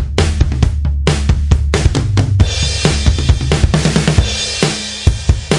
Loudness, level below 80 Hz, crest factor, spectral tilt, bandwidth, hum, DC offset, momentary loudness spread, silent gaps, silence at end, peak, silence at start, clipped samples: -14 LUFS; -18 dBFS; 12 dB; -5 dB/octave; 11.5 kHz; none; under 0.1%; 3 LU; none; 0 s; 0 dBFS; 0 s; under 0.1%